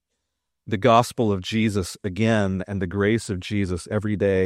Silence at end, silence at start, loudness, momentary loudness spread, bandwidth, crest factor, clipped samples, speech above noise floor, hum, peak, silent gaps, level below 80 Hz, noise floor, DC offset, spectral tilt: 0 s; 0.65 s; -23 LUFS; 9 LU; 14 kHz; 20 dB; under 0.1%; 58 dB; none; -2 dBFS; none; -52 dBFS; -80 dBFS; under 0.1%; -6 dB/octave